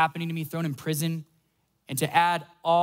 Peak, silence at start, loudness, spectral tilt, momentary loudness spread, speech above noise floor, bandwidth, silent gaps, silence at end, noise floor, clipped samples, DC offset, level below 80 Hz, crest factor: -8 dBFS; 0 s; -27 LUFS; -4.5 dB/octave; 9 LU; 45 dB; 16 kHz; none; 0 s; -71 dBFS; under 0.1%; under 0.1%; -74 dBFS; 18 dB